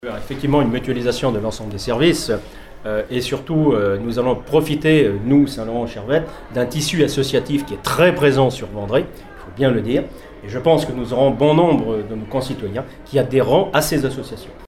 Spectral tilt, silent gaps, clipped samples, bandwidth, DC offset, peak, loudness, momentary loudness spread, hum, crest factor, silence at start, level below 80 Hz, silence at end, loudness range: -6 dB/octave; none; under 0.1%; 16 kHz; under 0.1%; -2 dBFS; -18 LUFS; 12 LU; none; 16 dB; 0.05 s; -40 dBFS; 0 s; 2 LU